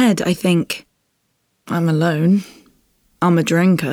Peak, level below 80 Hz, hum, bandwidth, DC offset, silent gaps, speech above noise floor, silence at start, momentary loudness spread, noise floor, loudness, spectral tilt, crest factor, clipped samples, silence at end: -2 dBFS; -58 dBFS; none; 16.5 kHz; under 0.1%; none; 52 dB; 0 s; 10 LU; -68 dBFS; -17 LUFS; -6.5 dB/octave; 14 dB; under 0.1%; 0 s